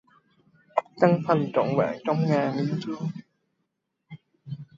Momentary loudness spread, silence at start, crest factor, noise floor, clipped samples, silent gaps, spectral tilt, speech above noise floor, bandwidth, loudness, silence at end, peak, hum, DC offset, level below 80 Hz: 18 LU; 0.75 s; 24 dB; -78 dBFS; under 0.1%; none; -8.5 dB/octave; 54 dB; 7.4 kHz; -25 LUFS; 0.15 s; -4 dBFS; none; under 0.1%; -70 dBFS